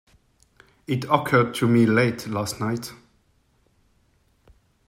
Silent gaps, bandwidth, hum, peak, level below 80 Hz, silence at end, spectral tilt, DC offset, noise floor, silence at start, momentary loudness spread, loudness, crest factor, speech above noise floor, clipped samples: none; 16 kHz; none; -2 dBFS; -60 dBFS; 1.9 s; -6 dB/octave; under 0.1%; -64 dBFS; 0.9 s; 13 LU; -22 LUFS; 22 dB; 43 dB; under 0.1%